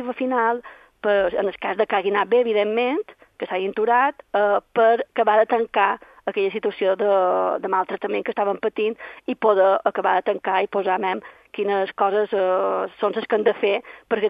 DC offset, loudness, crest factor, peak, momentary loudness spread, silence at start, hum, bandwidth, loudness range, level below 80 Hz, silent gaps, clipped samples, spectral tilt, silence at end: under 0.1%; -21 LUFS; 18 dB; -4 dBFS; 8 LU; 0 s; none; 5.2 kHz; 2 LU; -64 dBFS; none; under 0.1%; -7 dB/octave; 0 s